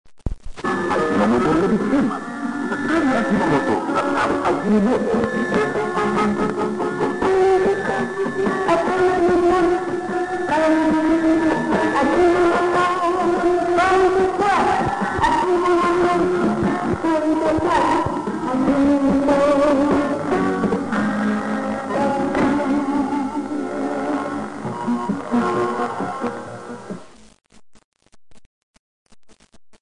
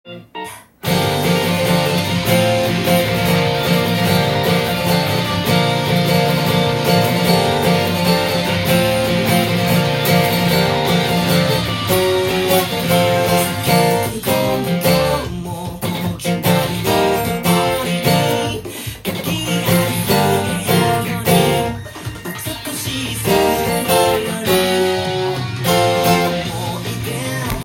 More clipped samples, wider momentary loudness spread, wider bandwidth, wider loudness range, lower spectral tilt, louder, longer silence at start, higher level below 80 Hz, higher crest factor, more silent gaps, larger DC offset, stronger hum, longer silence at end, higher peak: neither; about the same, 8 LU vs 8 LU; second, 10.5 kHz vs 17 kHz; first, 6 LU vs 2 LU; about the same, -6 dB/octave vs -5 dB/octave; second, -19 LUFS vs -16 LUFS; first, 0.25 s vs 0.05 s; about the same, -44 dBFS vs -42 dBFS; about the same, 14 dB vs 16 dB; first, 27.84-27.92 s vs none; first, 0.4% vs under 0.1%; neither; first, 1.4 s vs 0 s; second, -6 dBFS vs 0 dBFS